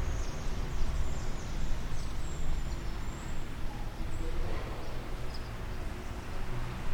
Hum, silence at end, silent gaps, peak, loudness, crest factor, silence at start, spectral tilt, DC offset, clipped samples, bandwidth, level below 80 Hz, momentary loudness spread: none; 0 s; none; -16 dBFS; -40 LUFS; 16 dB; 0 s; -5.5 dB/octave; under 0.1%; under 0.1%; 10.5 kHz; -34 dBFS; 4 LU